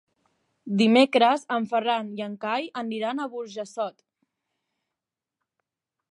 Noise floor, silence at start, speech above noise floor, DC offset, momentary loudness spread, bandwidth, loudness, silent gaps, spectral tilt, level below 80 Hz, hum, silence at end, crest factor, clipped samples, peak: -88 dBFS; 0.65 s; 64 dB; under 0.1%; 15 LU; 11 kHz; -25 LUFS; none; -5.5 dB/octave; -82 dBFS; none; 2.2 s; 22 dB; under 0.1%; -6 dBFS